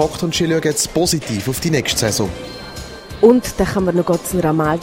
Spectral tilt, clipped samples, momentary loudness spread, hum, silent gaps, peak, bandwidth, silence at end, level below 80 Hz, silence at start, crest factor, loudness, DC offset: -4.5 dB/octave; under 0.1%; 17 LU; none; none; 0 dBFS; 16.5 kHz; 0 s; -38 dBFS; 0 s; 18 dB; -17 LUFS; under 0.1%